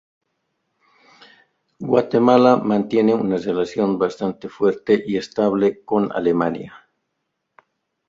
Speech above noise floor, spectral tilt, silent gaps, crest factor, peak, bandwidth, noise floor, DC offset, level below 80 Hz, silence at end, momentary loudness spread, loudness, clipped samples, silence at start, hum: 58 dB; -7.5 dB/octave; none; 18 dB; -2 dBFS; 7.6 kHz; -76 dBFS; under 0.1%; -60 dBFS; 1.3 s; 10 LU; -19 LUFS; under 0.1%; 1.8 s; none